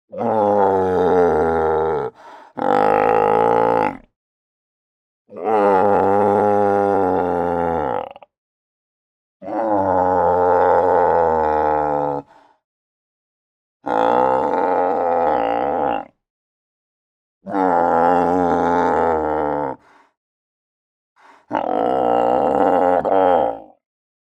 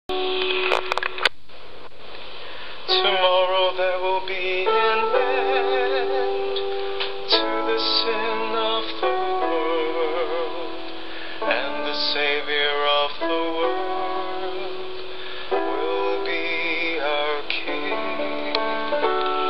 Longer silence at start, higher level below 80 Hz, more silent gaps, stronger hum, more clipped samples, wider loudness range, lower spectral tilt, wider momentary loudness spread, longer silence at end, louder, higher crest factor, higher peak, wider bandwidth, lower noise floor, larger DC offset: about the same, 0.15 s vs 0.1 s; first, -52 dBFS vs -58 dBFS; first, 4.16-5.25 s, 8.38-9.40 s, 12.64-13.80 s, 16.30-17.41 s, 20.17-21.16 s vs none; neither; neither; about the same, 4 LU vs 4 LU; first, -7.5 dB/octave vs -4 dB/octave; second, 9 LU vs 13 LU; first, 0.65 s vs 0 s; first, -17 LUFS vs -23 LUFS; about the same, 18 dB vs 22 dB; about the same, 0 dBFS vs -2 dBFS; second, 9.2 kHz vs 10.5 kHz; second, -40 dBFS vs -45 dBFS; second, under 0.1% vs 4%